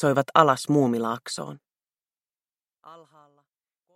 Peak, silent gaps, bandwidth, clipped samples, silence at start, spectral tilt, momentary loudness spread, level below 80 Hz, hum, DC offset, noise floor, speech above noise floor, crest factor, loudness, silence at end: -2 dBFS; none; 16 kHz; under 0.1%; 0 s; -5.5 dB/octave; 15 LU; -72 dBFS; none; under 0.1%; under -90 dBFS; over 68 dB; 24 dB; -23 LUFS; 1 s